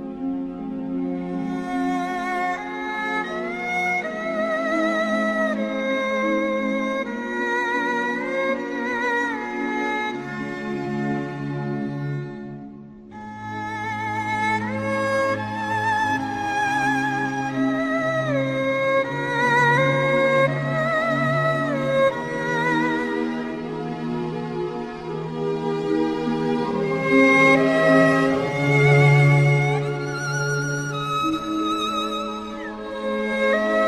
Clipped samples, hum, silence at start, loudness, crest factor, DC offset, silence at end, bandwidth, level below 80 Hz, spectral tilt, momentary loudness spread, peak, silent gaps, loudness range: under 0.1%; none; 0 s; -22 LUFS; 18 dB; under 0.1%; 0 s; 12 kHz; -54 dBFS; -6 dB/octave; 12 LU; -4 dBFS; none; 9 LU